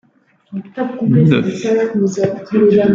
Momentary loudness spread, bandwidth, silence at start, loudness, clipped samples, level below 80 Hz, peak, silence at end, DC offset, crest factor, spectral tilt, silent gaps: 15 LU; 7.6 kHz; 0.5 s; -15 LUFS; under 0.1%; -52 dBFS; 0 dBFS; 0 s; under 0.1%; 14 dB; -8 dB/octave; none